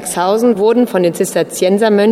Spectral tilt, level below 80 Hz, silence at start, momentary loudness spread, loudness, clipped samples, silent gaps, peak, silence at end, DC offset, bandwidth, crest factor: -5 dB/octave; -56 dBFS; 0 s; 4 LU; -13 LUFS; under 0.1%; none; -2 dBFS; 0 s; under 0.1%; 16 kHz; 10 dB